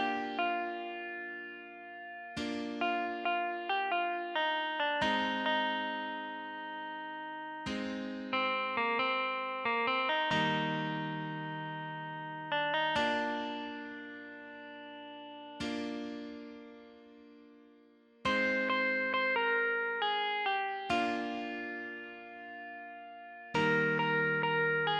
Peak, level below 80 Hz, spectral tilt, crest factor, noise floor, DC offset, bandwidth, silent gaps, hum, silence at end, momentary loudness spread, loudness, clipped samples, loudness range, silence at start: -18 dBFS; -70 dBFS; -5 dB/octave; 16 dB; -62 dBFS; under 0.1%; 11 kHz; none; none; 0 s; 17 LU; -33 LUFS; under 0.1%; 8 LU; 0 s